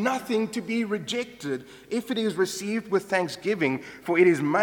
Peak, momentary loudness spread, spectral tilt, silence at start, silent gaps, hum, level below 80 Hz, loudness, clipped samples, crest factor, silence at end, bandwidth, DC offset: -8 dBFS; 12 LU; -5 dB/octave; 0 s; none; none; -68 dBFS; -26 LUFS; under 0.1%; 18 dB; 0 s; 18.5 kHz; under 0.1%